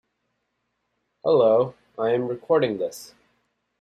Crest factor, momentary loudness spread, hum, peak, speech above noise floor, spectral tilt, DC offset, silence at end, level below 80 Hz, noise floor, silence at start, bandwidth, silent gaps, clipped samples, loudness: 16 dB; 12 LU; none; -8 dBFS; 55 dB; -6 dB/octave; under 0.1%; 0.75 s; -68 dBFS; -76 dBFS; 1.25 s; 14 kHz; none; under 0.1%; -23 LUFS